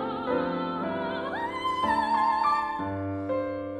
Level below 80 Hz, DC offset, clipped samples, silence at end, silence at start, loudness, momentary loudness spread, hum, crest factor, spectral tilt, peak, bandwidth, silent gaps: -58 dBFS; under 0.1%; under 0.1%; 0 s; 0 s; -28 LUFS; 7 LU; none; 14 dB; -6.5 dB/octave; -14 dBFS; 12 kHz; none